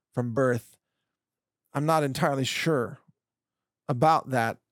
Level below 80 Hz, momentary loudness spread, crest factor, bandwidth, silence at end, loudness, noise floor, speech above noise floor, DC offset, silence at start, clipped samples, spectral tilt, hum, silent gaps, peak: -68 dBFS; 11 LU; 20 dB; 19 kHz; 0.2 s; -26 LUFS; under -90 dBFS; over 64 dB; under 0.1%; 0.15 s; under 0.1%; -5.5 dB/octave; none; none; -10 dBFS